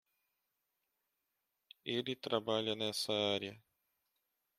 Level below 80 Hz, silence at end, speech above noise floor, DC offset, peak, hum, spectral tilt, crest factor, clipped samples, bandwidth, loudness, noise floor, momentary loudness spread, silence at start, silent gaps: -82 dBFS; 1 s; 49 dB; under 0.1%; -18 dBFS; none; -4 dB/octave; 24 dB; under 0.1%; 15.5 kHz; -37 LUFS; -86 dBFS; 6 LU; 1.85 s; none